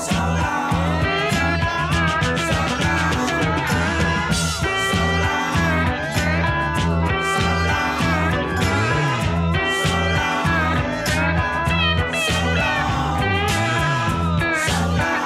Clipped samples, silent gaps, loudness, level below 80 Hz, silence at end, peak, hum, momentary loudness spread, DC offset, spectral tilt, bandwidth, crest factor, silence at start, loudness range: under 0.1%; none; -19 LUFS; -32 dBFS; 0 s; -6 dBFS; none; 2 LU; under 0.1%; -4.5 dB/octave; 15 kHz; 12 dB; 0 s; 0 LU